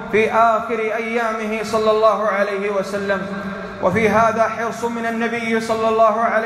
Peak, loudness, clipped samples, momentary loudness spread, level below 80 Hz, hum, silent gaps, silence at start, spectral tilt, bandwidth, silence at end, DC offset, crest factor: -4 dBFS; -18 LUFS; under 0.1%; 8 LU; -52 dBFS; none; none; 0 s; -5 dB/octave; 13.5 kHz; 0 s; under 0.1%; 14 dB